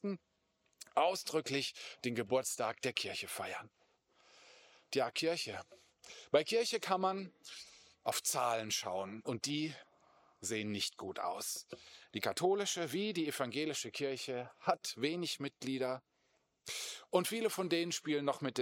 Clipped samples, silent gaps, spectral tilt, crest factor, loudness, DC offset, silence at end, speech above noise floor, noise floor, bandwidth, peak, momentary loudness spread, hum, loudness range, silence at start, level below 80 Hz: under 0.1%; none; -3 dB/octave; 22 dB; -37 LUFS; under 0.1%; 0 s; 41 dB; -79 dBFS; 17 kHz; -16 dBFS; 12 LU; none; 3 LU; 0.05 s; -84 dBFS